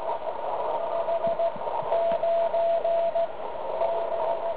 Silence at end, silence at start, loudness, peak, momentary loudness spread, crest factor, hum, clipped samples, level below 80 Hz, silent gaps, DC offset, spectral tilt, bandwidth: 0 s; 0 s; -27 LUFS; -14 dBFS; 7 LU; 12 dB; none; under 0.1%; -62 dBFS; none; 1%; -8 dB/octave; 4 kHz